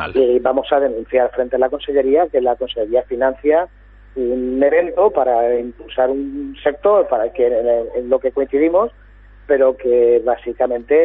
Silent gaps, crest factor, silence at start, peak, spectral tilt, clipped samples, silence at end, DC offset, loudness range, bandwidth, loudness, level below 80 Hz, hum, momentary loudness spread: none; 14 dB; 0 s; -2 dBFS; -10 dB/octave; under 0.1%; 0 s; under 0.1%; 1 LU; 4 kHz; -17 LUFS; -44 dBFS; none; 7 LU